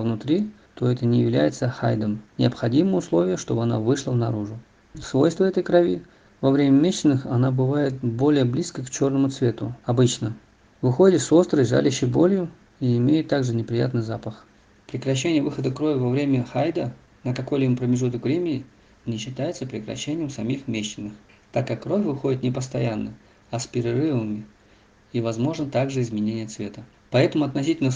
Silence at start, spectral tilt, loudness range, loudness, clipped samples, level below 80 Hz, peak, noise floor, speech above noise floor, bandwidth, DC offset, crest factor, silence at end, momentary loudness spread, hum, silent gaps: 0 s; -6.5 dB/octave; 7 LU; -23 LUFS; under 0.1%; -56 dBFS; -4 dBFS; -55 dBFS; 33 dB; 9.8 kHz; under 0.1%; 18 dB; 0 s; 12 LU; none; none